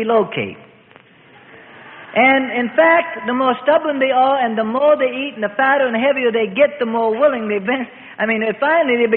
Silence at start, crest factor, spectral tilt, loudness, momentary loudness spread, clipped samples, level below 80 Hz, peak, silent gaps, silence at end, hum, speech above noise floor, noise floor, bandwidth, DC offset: 0 s; 16 dB; -10 dB/octave; -16 LUFS; 9 LU; under 0.1%; -64 dBFS; 0 dBFS; none; 0 s; none; 31 dB; -47 dBFS; 4.2 kHz; under 0.1%